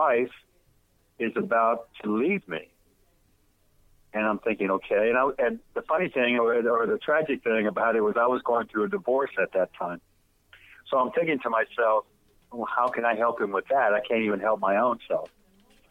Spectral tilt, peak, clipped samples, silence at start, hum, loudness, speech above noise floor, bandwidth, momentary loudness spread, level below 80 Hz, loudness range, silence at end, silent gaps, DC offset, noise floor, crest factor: -7 dB/octave; -10 dBFS; under 0.1%; 0 s; none; -26 LUFS; 40 dB; 5.2 kHz; 8 LU; -66 dBFS; 5 LU; 0.65 s; none; under 0.1%; -65 dBFS; 16 dB